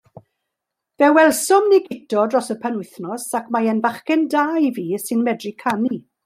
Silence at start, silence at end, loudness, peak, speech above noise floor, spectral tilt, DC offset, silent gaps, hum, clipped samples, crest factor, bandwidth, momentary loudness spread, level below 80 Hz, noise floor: 1 s; 0.25 s; -19 LUFS; -2 dBFS; 63 dB; -4.5 dB/octave; under 0.1%; none; none; under 0.1%; 16 dB; 16 kHz; 11 LU; -70 dBFS; -81 dBFS